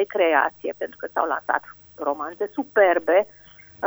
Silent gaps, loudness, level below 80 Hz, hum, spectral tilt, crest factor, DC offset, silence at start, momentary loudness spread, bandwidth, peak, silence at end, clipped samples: none; -23 LUFS; -66 dBFS; 50 Hz at -65 dBFS; -5 dB/octave; 18 dB; under 0.1%; 0 s; 12 LU; over 20 kHz; -4 dBFS; 0 s; under 0.1%